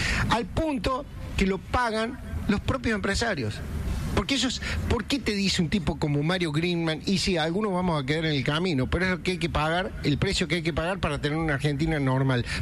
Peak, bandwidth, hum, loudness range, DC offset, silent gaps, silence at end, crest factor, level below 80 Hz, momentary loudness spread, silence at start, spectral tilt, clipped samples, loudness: -12 dBFS; 14 kHz; none; 2 LU; under 0.1%; none; 0 s; 14 dB; -38 dBFS; 4 LU; 0 s; -5 dB/octave; under 0.1%; -26 LUFS